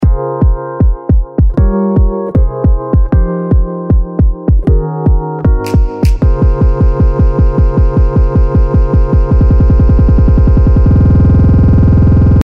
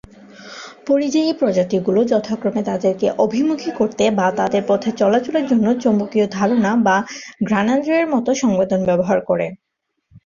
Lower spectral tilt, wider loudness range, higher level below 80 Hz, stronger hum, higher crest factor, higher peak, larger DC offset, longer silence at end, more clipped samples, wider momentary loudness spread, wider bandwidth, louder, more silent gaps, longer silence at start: first, -10.5 dB/octave vs -6 dB/octave; first, 4 LU vs 1 LU; first, -10 dBFS vs -56 dBFS; neither; second, 8 dB vs 16 dB; about the same, 0 dBFS vs -2 dBFS; neither; about the same, 0.05 s vs 0.1 s; neither; about the same, 6 LU vs 5 LU; second, 5.6 kHz vs 7.4 kHz; first, -10 LUFS vs -18 LUFS; neither; second, 0 s vs 0.4 s